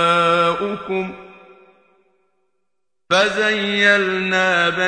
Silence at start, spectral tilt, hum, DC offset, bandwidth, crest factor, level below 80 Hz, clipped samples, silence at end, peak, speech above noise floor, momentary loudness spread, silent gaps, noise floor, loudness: 0 s; -4 dB/octave; none; under 0.1%; 10 kHz; 18 dB; -58 dBFS; under 0.1%; 0 s; -2 dBFS; 61 dB; 10 LU; none; -79 dBFS; -17 LUFS